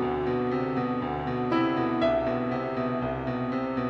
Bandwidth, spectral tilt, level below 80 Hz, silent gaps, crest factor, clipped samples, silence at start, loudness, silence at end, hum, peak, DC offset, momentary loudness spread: 6.6 kHz; -8.5 dB/octave; -50 dBFS; none; 14 dB; under 0.1%; 0 s; -28 LUFS; 0 s; none; -14 dBFS; under 0.1%; 5 LU